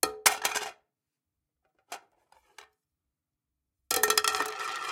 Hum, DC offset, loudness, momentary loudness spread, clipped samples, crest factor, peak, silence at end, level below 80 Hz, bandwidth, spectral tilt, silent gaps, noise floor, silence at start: none; under 0.1%; -27 LUFS; 22 LU; under 0.1%; 28 dB; -4 dBFS; 0 s; -72 dBFS; 17 kHz; 1 dB/octave; none; -87 dBFS; 0.05 s